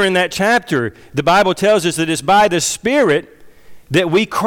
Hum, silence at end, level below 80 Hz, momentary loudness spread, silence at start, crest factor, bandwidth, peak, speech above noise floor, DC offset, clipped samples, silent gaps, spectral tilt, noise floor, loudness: none; 0 s; -48 dBFS; 7 LU; 0 s; 10 dB; 18.5 kHz; -6 dBFS; 23 dB; under 0.1%; under 0.1%; none; -4 dB/octave; -37 dBFS; -15 LUFS